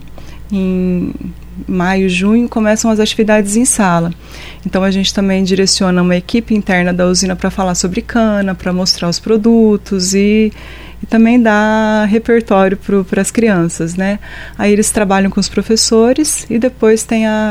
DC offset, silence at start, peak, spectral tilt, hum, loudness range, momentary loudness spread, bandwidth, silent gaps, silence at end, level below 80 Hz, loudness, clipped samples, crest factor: under 0.1%; 0 s; 0 dBFS; -4.5 dB/octave; none; 2 LU; 8 LU; 15.5 kHz; none; 0 s; -34 dBFS; -12 LUFS; under 0.1%; 12 dB